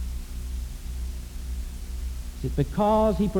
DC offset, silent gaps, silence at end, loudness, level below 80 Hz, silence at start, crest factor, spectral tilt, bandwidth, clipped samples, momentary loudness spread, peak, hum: under 0.1%; none; 0 s; -29 LUFS; -32 dBFS; 0 s; 16 dB; -7.5 dB/octave; 19.5 kHz; under 0.1%; 15 LU; -12 dBFS; 60 Hz at -40 dBFS